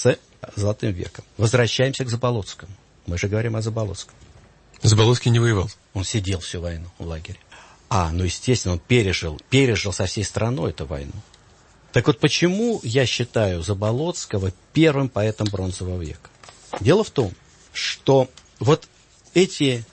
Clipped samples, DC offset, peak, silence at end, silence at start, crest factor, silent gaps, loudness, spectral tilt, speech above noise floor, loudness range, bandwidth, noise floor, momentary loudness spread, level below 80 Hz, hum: under 0.1%; under 0.1%; -4 dBFS; 0.1 s; 0 s; 18 dB; none; -22 LUFS; -5.5 dB/octave; 31 dB; 3 LU; 8.8 kHz; -52 dBFS; 15 LU; -44 dBFS; none